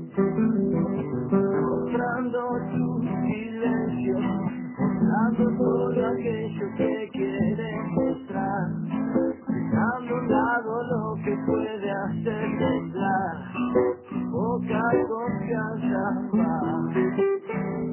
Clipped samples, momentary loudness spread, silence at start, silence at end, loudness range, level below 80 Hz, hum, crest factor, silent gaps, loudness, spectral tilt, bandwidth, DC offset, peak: under 0.1%; 6 LU; 0 s; 0 s; 2 LU; -54 dBFS; none; 16 dB; none; -26 LUFS; -12 dB/octave; 3.2 kHz; under 0.1%; -10 dBFS